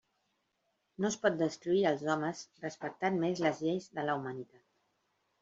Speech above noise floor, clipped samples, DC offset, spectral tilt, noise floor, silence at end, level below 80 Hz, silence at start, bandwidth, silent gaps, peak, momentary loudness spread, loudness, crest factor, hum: 47 dB; under 0.1%; under 0.1%; -5.5 dB/octave; -80 dBFS; 1 s; -76 dBFS; 1 s; 7.8 kHz; none; -14 dBFS; 12 LU; -34 LUFS; 20 dB; none